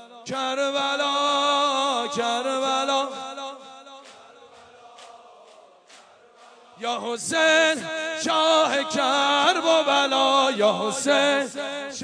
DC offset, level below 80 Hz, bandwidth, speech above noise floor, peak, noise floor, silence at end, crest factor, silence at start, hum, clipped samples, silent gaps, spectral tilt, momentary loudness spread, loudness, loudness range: under 0.1%; -76 dBFS; 10.5 kHz; 30 dB; -4 dBFS; -51 dBFS; 0 s; 18 dB; 0 s; none; under 0.1%; none; -1.5 dB/octave; 12 LU; -22 LUFS; 16 LU